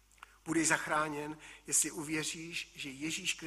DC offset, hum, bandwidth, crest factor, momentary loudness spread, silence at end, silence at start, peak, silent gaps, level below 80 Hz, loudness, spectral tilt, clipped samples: under 0.1%; none; 14.5 kHz; 22 dB; 13 LU; 0 s; 0.45 s; -14 dBFS; none; -68 dBFS; -34 LUFS; -2 dB/octave; under 0.1%